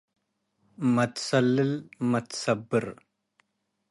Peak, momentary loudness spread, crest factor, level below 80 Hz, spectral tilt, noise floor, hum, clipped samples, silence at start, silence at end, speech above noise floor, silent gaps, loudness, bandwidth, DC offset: -10 dBFS; 6 LU; 20 dB; -68 dBFS; -5.5 dB/octave; -78 dBFS; none; under 0.1%; 0.8 s; 1 s; 52 dB; none; -27 LUFS; 11.5 kHz; under 0.1%